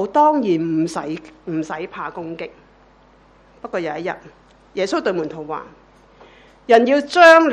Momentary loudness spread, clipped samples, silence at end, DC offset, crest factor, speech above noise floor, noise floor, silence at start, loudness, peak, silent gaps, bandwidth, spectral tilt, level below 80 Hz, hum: 19 LU; under 0.1%; 0 s; under 0.1%; 18 dB; 34 dB; -51 dBFS; 0 s; -18 LUFS; 0 dBFS; none; 11.5 kHz; -5 dB/octave; -58 dBFS; none